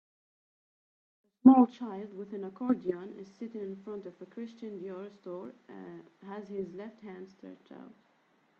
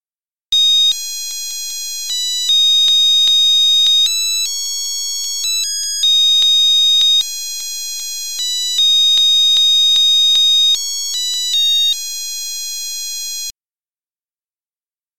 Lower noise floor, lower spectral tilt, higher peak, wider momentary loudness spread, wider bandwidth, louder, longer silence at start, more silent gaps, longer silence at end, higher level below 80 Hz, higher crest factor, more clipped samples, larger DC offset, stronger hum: second, -69 dBFS vs under -90 dBFS; first, -9 dB/octave vs 5.5 dB/octave; about the same, -6 dBFS vs -6 dBFS; first, 25 LU vs 13 LU; second, 4.5 kHz vs 16.5 kHz; second, -30 LUFS vs -11 LUFS; first, 1.45 s vs 0 s; second, none vs 13.88-13.93 s, 14.67-14.71 s; first, 0.7 s vs 0 s; second, -80 dBFS vs -64 dBFS; first, 26 dB vs 10 dB; neither; second, under 0.1% vs 2%; neither